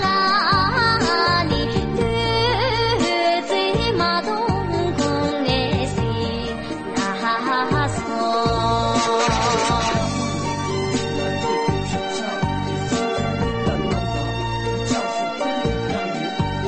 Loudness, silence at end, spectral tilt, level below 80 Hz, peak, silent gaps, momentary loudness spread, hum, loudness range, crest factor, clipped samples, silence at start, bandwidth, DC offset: -21 LUFS; 0 s; -5 dB/octave; -36 dBFS; -6 dBFS; none; 7 LU; none; 4 LU; 14 dB; under 0.1%; 0 s; 8.8 kHz; under 0.1%